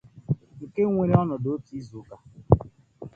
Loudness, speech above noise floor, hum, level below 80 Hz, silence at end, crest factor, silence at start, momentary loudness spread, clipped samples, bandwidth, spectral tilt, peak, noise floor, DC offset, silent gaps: -25 LUFS; 20 dB; none; -42 dBFS; 0.1 s; 26 dB; 0.15 s; 22 LU; under 0.1%; 6.8 kHz; -11 dB/octave; 0 dBFS; -44 dBFS; under 0.1%; none